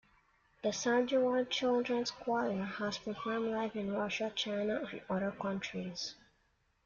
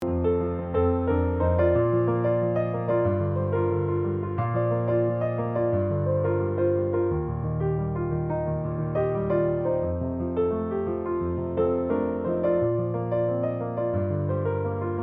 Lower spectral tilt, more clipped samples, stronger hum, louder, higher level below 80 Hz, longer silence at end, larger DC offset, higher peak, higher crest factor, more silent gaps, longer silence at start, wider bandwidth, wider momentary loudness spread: second, -4.5 dB/octave vs -12 dB/octave; neither; neither; second, -35 LUFS vs -26 LUFS; second, -70 dBFS vs -48 dBFS; first, 0.7 s vs 0 s; neither; second, -20 dBFS vs -12 dBFS; about the same, 16 dB vs 12 dB; neither; first, 0.65 s vs 0 s; first, 7.4 kHz vs 3.8 kHz; first, 8 LU vs 4 LU